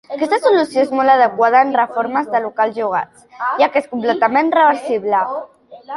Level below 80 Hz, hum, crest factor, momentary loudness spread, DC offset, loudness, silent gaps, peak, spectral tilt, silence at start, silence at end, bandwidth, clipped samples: -66 dBFS; none; 14 dB; 9 LU; under 0.1%; -16 LUFS; none; -2 dBFS; -5 dB/octave; 0.1 s; 0 s; 11.5 kHz; under 0.1%